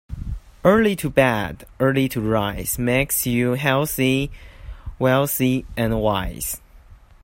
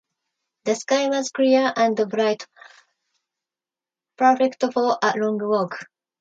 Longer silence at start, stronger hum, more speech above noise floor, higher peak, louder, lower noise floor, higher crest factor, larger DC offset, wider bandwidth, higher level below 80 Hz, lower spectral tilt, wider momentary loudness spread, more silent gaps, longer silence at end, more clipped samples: second, 0.1 s vs 0.65 s; neither; second, 26 dB vs over 69 dB; about the same, -2 dBFS vs -4 dBFS; about the same, -20 LUFS vs -21 LUFS; second, -46 dBFS vs under -90 dBFS; about the same, 20 dB vs 18 dB; neither; first, 16.5 kHz vs 9 kHz; first, -38 dBFS vs -76 dBFS; about the same, -5 dB/octave vs -4 dB/octave; about the same, 14 LU vs 12 LU; neither; about the same, 0.3 s vs 0.4 s; neither